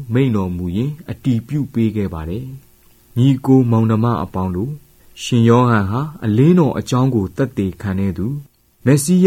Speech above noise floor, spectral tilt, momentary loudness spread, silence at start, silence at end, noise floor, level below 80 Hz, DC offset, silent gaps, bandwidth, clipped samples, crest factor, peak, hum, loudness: 33 dB; -7 dB/octave; 13 LU; 0 s; 0 s; -48 dBFS; -44 dBFS; under 0.1%; none; 16 kHz; under 0.1%; 16 dB; 0 dBFS; none; -17 LUFS